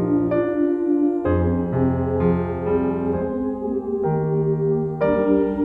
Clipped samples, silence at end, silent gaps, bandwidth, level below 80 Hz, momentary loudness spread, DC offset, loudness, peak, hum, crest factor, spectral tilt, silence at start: under 0.1%; 0 s; none; 3.8 kHz; -42 dBFS; 4 LU; under 0.1%; -21 LUFS; -6 dBFS; none; 14 dB; -11.5 dB/octave; 0 s